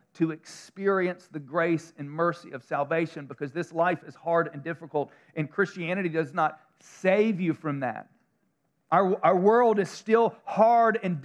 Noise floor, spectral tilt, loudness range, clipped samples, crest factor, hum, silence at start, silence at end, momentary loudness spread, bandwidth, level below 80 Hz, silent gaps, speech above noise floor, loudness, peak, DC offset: -74 dBFS; -7 dB/octave; 5 LU; under 0.1%; 18 dB; none; 0.2 s; 0 s; 13 LU; 11 kHz; -86 dBFS; none; 47 dB; -26 LUFS; -8 dBFS; under 0.1%